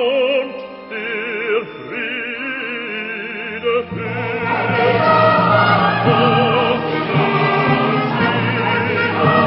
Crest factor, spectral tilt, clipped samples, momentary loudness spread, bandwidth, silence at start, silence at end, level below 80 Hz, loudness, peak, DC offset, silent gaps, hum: 16 dB; -11 dB/octave; under 0.1%; 11 LU; 5.8 kHz; 0 s; 0 s; -50 dBFS; -16 LUFS; -2 dBFS; under 0.1%; none; none